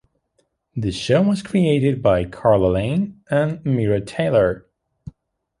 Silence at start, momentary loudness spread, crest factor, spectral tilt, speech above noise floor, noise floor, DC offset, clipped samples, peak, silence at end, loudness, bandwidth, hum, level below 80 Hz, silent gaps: 0.75 s; 7 LU; 18 dB; -7.5 dB/octave; 49 dB; -68 dBFS; under 0.1%; under 0.1%; -2 dBFS; 0.5 s; -19 LUFS; 11.5 kHz; none; -42 dBFS; none